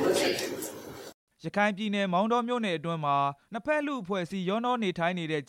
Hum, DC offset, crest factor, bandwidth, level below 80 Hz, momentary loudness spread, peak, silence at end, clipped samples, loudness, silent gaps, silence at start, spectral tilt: none; under 0.1%; 18 dB; 16.5 kHz; -70 dBFS; 12 LU; -12 dBFS; 0.05 s; under 0.1%; -29 LUFS; 1.14-1.27 s; 0 s; -5 dB/octave